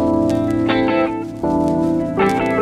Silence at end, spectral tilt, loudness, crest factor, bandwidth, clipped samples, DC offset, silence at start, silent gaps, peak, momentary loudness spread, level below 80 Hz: 0 s; -7 dB/octave; -18 LUFS; 14 dB; 12 kHz; under 0.1%; under 0.1%; 0 s; none; -2 dBFS; 4 LU; -40 dBFS